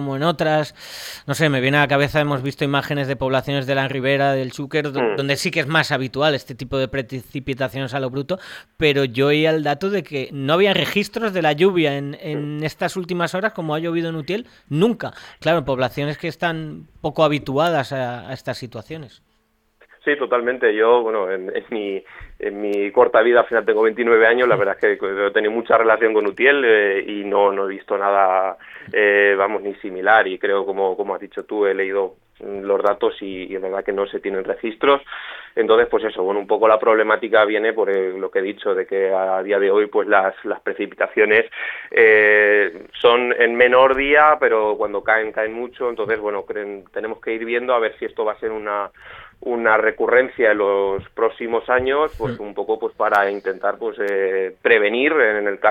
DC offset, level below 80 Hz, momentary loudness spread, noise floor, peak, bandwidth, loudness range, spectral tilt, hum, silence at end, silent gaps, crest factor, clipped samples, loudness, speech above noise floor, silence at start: under 0.1%; -54 dBFS; 13 LU; -64 dBFS; -2 dBFS; 16 kHz; 7 LU; -5.5 dB/octave; none; 0 s; none; 18 dB; under 0.1%; -19 LUFS; 45 dB; 0 s